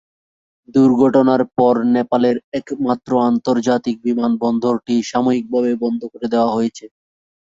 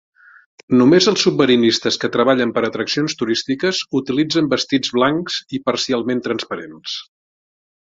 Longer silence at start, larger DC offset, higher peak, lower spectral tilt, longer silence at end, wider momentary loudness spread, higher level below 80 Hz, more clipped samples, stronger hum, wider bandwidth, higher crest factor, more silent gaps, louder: about the same, 0.7 s vs 0.7 s; neither; about the same, -2 dBFS vs -2 dBFS; first, -6.5 dB/octave vs -4.5 dB/octave; about the same, 0.7 s vs 0.8 s; second, 8 LU vs 11 LU; about the same, -58 dBFS vs -58 dBFS; neither; neither; about the same, 7.6 kHz vs 7.8 kHz; about the same, 16 dB vs 16 dB; first, 2.44-2.52 s vs none; about the same, -17 LUFS vs -17 LUFS